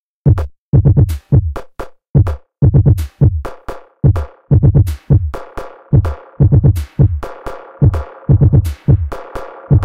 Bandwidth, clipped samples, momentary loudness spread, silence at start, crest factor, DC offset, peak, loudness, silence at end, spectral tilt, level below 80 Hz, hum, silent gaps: 13.5 kHz; under 0.1%; 19 LU; 0.25 s; 10 dB; 0.4%; -2 dBFS; -14 LUFS; 0 s; -9.5 dB/octave; -22 dBFS; none; 0.58-0.73 s, 2.10-2.14 s